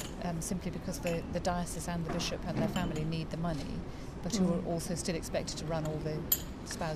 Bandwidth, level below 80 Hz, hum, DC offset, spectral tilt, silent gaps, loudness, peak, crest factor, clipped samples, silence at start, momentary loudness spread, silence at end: 15 kHz; -46 dBFS; none; under 0.1%; -5 dB/octave; none; -35 LUFS; -14 dBFS; 20 dB; under 0.1%; 0 s; 7 LU; 0 s